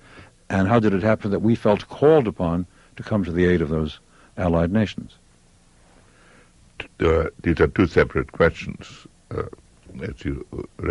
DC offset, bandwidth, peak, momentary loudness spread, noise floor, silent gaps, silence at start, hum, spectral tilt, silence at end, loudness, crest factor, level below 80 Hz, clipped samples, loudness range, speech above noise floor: under 0.1%; 11.5 kHz; -4 dBFS; 18 LU; -55 dBFS; none; 0.15 s; none; -8 dB/octave; 0 s; -21 LUFS; 18 dB; -40 dBFS; under 0.1%; 5 LU; 34 dB